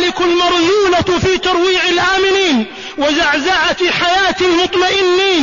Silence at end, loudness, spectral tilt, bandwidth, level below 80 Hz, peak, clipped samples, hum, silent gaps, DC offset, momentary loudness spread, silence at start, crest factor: 0 s; -12 LUFS; -3.5 dB/octave; 7.4 kHz; -40 dBFS; -2 dBFS; under 0.1%; none; none; 0.4%; 2 LU; 0 s; 10 dB